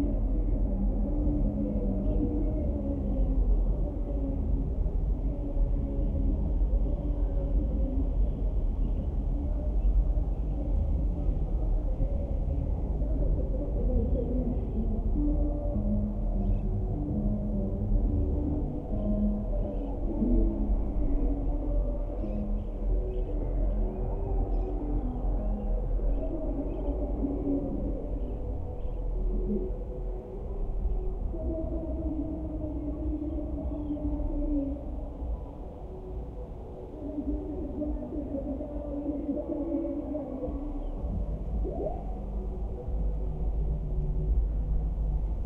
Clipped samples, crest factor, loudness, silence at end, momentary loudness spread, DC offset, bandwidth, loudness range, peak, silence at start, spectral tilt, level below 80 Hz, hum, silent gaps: under 0.1%; 14 dB; -33 LUFS; 0 s; 7 LU; under 0.1%; 2.2 kHz; 5 LU; -16 dBFS; 0 s; -12 dB/octave; -30 dBFS; none; none